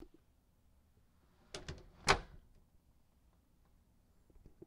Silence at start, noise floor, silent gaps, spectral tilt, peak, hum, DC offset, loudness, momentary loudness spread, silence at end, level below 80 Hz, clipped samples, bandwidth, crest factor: 0 s; -71 dBFS; none; -2.5 dB/octave; -12 dBFS; none; under 0.1%; -35 LUFS; 19 LU; 2.25 s; -58 dBFS; under 0.1%; 15.5 kHz; 32 dB